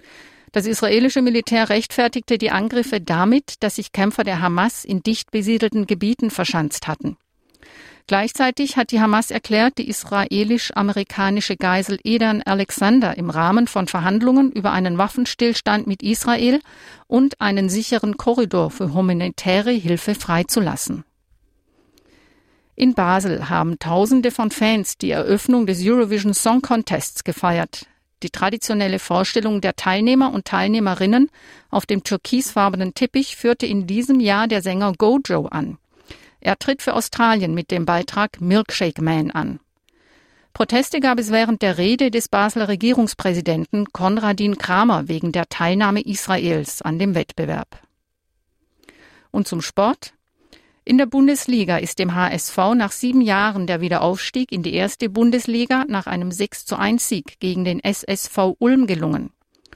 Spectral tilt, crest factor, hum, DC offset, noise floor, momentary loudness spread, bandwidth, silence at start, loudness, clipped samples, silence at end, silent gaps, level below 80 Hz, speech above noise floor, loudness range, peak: -5 dB/octave; 16 dB; none; under 0.1%; -71 dBFS; 7 LU; 16 kHz; 0.2 s; -19 LUFS; under 0.1%; 0.5 s; none; -52 dBFS; 53 dB; 4 LU; -2 dBFS